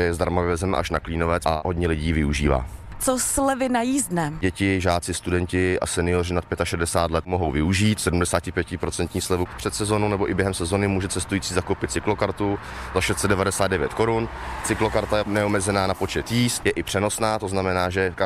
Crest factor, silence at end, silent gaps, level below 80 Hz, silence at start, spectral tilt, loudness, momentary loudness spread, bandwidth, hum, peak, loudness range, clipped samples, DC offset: 16 dB; 0 s; none; -38 dBFS; 0 s; -4.5 dB/octave; -23 LUFS; 5 LU; 15.5 kHz; none; -6 dBFS; 1 LU; under 0.1%; under 0.1%